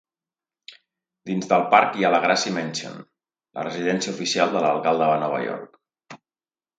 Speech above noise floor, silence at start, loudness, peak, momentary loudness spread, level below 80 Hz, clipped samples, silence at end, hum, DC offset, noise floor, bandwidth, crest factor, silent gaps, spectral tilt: over 68 dB; 0.7 s; -22 LUFS; 0 dBFS; 17 LU; -72 dBFS; under 0.1%; 0.6 s; none; under 0.1%; under -90 dBFS; 9.4 kHz; 24 dB; none; -4 dB/octave